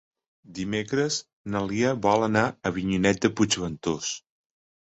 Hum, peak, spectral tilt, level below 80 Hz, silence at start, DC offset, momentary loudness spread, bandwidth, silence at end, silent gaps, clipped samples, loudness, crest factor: none; -6 dBFS; -4.5 dB/octave; -54 dBFS; 0.5 s; under 0.1%; 10 LU; 8.2 kHz; 0.75 s; 1.33-1.45 s; under 0.1%; -26 LUFS; 20 dB